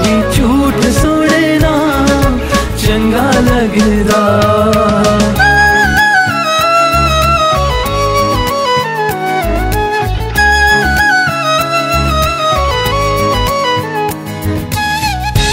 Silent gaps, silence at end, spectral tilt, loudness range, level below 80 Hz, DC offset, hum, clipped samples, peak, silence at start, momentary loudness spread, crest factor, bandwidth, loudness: none; 0 s; -4.5 dB/octave; 4 LU; -22 dBFS; under 0.1%; none; under 0.1%; 0 dBFS; 0 s; 6 LU; 10 dB; 16.5 kHz; -11 LUFS